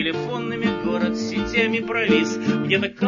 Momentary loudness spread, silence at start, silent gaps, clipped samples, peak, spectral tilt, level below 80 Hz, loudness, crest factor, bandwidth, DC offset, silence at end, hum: 5 LU; 0 s; none; under 0.1%; -4 dBFS; -5.5 dB/octave; -48 dBFS; -22 LUFS; 18 dB; 7.4 kHz; under 0.1%; 0 s; none